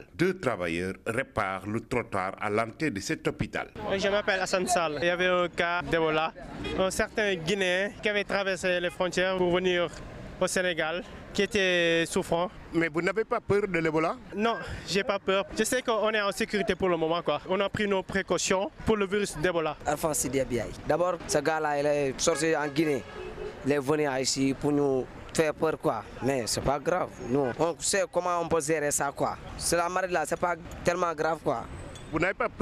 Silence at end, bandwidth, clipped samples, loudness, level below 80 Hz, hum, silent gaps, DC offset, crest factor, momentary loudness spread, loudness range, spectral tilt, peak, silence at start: 0 s; 15.5 kHz; under 0.1%; -28 LUFS; -50 dBFS; none; none; under 0.1%; 16 dB; 6 LU; 2 LU; -4 dB/octave; -12 dBFS; 0 s